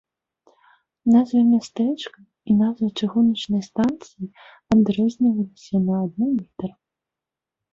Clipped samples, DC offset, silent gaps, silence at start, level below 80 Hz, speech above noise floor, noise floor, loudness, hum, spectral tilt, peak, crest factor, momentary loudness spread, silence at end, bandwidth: under 0.1%; under 0.1%; none; 1.05 s; -58 dBFS; 67 dB; -87 dBFS; -21 LUFS; none; -7.5 dB/octave; -8 dBFS; 14 dB; 16 LU; 1.05 s; 7.6 kHz